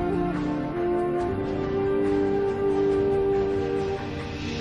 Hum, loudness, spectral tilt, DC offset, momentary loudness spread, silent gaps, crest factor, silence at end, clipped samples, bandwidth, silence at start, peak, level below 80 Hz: none; -26 LUFS; -7.5 dB/octave; under 0.1%; 6 LU; none; 10 dB; 0 s; under 0.1%; 8.6 kHz; 0 s; -14 dBFS; -44 dBFS